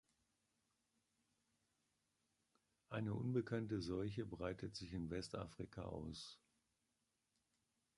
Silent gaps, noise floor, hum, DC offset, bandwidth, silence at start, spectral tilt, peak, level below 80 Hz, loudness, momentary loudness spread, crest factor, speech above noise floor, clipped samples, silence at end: none; -88 dBFS; none; under 0.1%; 11 kHz; 2.9 s; -6.5 dB/octave; -30 dBFS; -68 dBFS; -47 LUFS; 10 LU; 20 dB; 42 dB; under 0.1%; 1.6 s